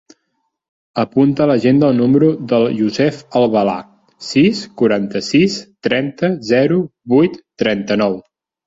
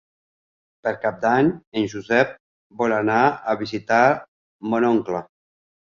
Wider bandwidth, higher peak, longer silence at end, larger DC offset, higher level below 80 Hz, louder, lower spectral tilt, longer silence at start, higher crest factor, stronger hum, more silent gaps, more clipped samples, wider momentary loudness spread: about the same, 7.8 kHz vs 7.2 kHz; about the same, 0 dBFS vs -2 dBFS; second, 0.45 s vs 0.75 s; neither; first, -54 dBFS vs -60 dBFS; first, -15 LUFS vs -21 LUFS; about the same, -6.5 dB/octave vs -6.5 dB/octave; about the same, 0.95 s vs 0.85 s; second, 14 dB vs 20 dB; neither; second, none vs 1.67-1.72 s, 2.40-2.70 s, 4.28-4.59 s; neither; second, 7 LU vs 10 LU